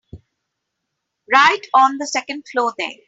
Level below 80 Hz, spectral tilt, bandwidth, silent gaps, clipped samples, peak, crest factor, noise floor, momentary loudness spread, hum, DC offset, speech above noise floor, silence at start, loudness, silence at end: -60 dBFS; -1.5 dB/octave; 8 kHz; none; under 0.1%; -2 dBFS; 18 dB; -77 dBFS; 10 LU; none; under 0.1%; 60 dB; 0.15 s; -16 LUFS; 0.15 s